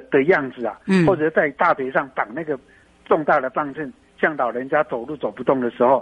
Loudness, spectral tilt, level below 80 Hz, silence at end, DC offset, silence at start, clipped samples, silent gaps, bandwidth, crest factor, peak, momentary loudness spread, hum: -21 LUFS; -7.5 dB/octave; -58 dBFS; 0 s; under 0.1%; 0 s; under 0.1%; none; 9.2 kHz; 16 dB; -4 dBFS; 11 LU; none